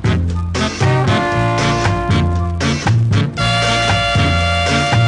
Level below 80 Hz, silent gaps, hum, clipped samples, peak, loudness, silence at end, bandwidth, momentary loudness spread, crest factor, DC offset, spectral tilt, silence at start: -24 dBFS; none; none; under 0.1%; -2 dBFS; -15 LUFS; 0 s; 10.5 kHz; 4 LU; 14 dB; under 0.1%; -5 dB/octave; 0 s